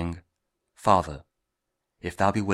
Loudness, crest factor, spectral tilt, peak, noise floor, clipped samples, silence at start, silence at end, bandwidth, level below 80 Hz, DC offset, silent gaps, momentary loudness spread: -25 LUFS; 24 dB; -6 dB/octave; -4 dBFS; -82 dBFS; under 0.1%; 0 s; 0 s; 14.5 kHz; -50 dBFS; under 0.1%; none; 18 LU